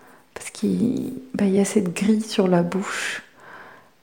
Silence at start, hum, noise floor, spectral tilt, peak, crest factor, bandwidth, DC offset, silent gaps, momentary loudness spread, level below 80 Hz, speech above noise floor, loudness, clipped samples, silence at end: 0.35 s; none; -45 dBFS; -5.5 dB/octave; -6 dBFS; 18 dB; 17 kHz; 0.1%; none; 20 LU; -62 dBFS; 24 dB; -22 LUFS; under 0.1%; 0.35 s